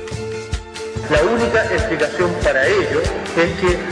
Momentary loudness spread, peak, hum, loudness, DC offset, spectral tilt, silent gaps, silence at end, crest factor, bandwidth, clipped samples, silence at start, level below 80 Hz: 11 LU; -2 dBFS; none; -18 LUFS; under 0.1%; -5 dB/octave; none; 0 s; 16 dB; 10.5 kHz; under 0.1%; 0 s; -32 dBFS